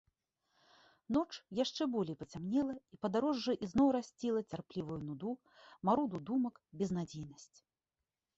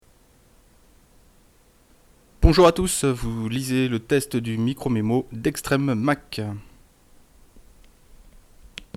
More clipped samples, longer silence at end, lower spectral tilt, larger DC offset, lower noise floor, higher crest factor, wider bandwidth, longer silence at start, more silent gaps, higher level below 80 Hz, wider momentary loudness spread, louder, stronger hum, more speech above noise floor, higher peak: neither; first, 0.95 s vs 0.15 s; about the same, -6 dB/octave vs -5.5 dB/octave; neither; first, under -90 dBFS vs -57 dBFS; about the same, 20 dB vs 24 dB; second, 8 kHz vs 16 kHz; second, 1.1 s vs 2.4 s; neither; second, -68 dBFS vs -34 dBFS; second, 11 LU vs 15 LU; second, -37 LUFS vs -22 LUFS; neither; first, over 53 dB vs 34 dB; second, -18 dBFS vs 0 dBFS